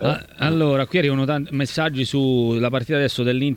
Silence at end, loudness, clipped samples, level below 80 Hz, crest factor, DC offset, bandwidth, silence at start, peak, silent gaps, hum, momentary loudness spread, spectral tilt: 0 s; -20 LUFS; under 0.1%; -52 dBFS; 16 dB; under 0.1%; 16 kHz; 0 s; -4 dBFS; none; none; 4 LU; -6.5 dB/octave